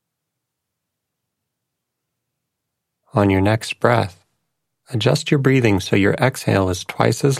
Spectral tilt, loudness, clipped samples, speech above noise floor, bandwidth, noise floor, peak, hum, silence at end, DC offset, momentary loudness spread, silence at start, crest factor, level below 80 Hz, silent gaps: -6 dB/octave; -18 LUFS; under 0.1%; 62 dB; 15 kHz; -79 dBFS; 0 dBFS; none; 0 s; under 0.1%; 6 LU; 3.15 s; 20 dB; -54 dBFS; none